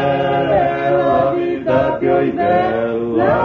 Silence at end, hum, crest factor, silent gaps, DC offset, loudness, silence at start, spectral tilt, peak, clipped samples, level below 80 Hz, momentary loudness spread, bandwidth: 0 s; none; 12 dB; none; under 0.1%; -16 LUFS; 0 s; -8.5 dB/octave; -2 dBFS; under 0.1%; -44 dBFS; 3 LU; 6.4 kHz